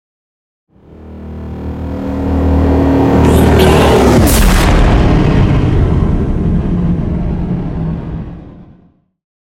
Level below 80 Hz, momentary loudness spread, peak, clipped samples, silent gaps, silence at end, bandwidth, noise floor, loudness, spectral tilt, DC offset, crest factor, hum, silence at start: -18 dBFS; 16 LU; 0 dBFS; 0.1%; none; 0.9 s; 17.5 kHz; -48 dBFS; -11 LUFS; -6.5 dB/octave; under 0.1%; 12 dB; none; 1 s